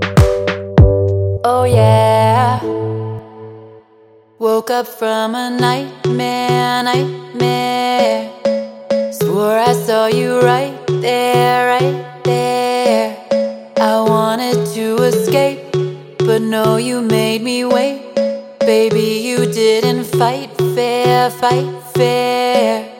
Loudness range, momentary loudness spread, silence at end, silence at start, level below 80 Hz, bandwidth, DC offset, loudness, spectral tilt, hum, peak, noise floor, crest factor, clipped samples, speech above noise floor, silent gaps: 3 LU; 7 LU; 0 s; 0 s; -32 dBFS; 17 kHz; under 0.1%; -15 LUFS; -5.5 dB/octave; none; 0 dBFS; -47 dBFS; 14 dB; under 0.1%; 33 dB; none